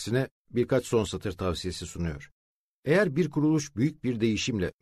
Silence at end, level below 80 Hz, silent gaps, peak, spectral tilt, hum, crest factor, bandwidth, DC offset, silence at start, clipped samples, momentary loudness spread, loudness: 0.1 s; -50 dBFS; 0.31-0.45 s, 2.32-2.83 s; -10 dBFS; -6 dB/octave; none; 18 dB; 13.5 kHz; under 0.1%; 0 s; under 0.1%; 10 LU; -28 LUFS